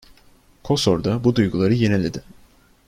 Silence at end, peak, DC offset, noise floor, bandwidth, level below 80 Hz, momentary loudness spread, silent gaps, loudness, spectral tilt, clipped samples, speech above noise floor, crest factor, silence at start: 0.65 s; -4 dBFS; under 0.1%; -53 dBFS; 15 kHz; -46 dBFS; 6 LU; none; -20 LUFS; -6.5 dB/octave; under 0.1%; 34 dB; 16 dB; 0.65 s